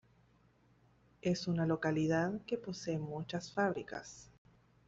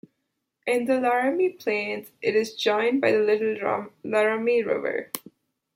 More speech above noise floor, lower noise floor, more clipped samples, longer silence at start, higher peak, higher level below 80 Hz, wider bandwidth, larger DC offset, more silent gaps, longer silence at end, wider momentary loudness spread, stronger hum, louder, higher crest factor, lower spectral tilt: second, 33 dB vs 55 dB; second, -69 dBFS vs -79 dBFS; neither; first, 1.25 s vs 0.65 s; second, -20 dBFS vs -6 dBFS; first, -68 dBFS vs -76 dBFS; second, 7.8 kHz vs 16.5 kHz; neither; neither; about the same, 0.6 s vs 0.55 s; first, 12 LU vs 9 LU; neither; second, -37 LUFS vs -24 LUFS; about the same, 18 dB vs 18 dB; first, -6 dB/octave vs -4.5 dB/octave